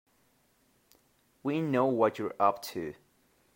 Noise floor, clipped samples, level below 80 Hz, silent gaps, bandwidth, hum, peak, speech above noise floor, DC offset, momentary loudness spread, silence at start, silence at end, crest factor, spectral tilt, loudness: -69 dBFS; under 0.1%; -76 dBFS; none; 16 kHz; none; -12 dBFS; 40 dB; under 0.1%; 12 LU; 1.45 s; 0.65 s; 22 dB; -6.5 dB/octave; -30 LUFS